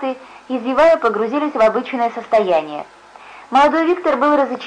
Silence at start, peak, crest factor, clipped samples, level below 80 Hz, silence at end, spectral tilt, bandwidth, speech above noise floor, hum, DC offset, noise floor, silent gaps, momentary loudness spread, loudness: 0 s; -6 dBFS; 10 dB; under 0.1%; -52 dBFS; 0 s; -5 dB/octave; 9.8 kHz; 24 dB; none; under 0.1%; -40 dBFS; none; 13 LU; -16 LUFS